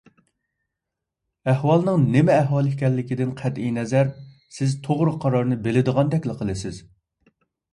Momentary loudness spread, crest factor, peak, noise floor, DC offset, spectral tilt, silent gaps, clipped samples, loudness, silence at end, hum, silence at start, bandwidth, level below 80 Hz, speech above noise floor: 10 LU; 18 dB; -6 dBFS; -84 dBFS; under 0.1%; -8 dB/octave; none; under 0.1%; -22 LUFS; 0.9 s; none; 1.45 s; 11 kHz; -54 dBFS; 63 dB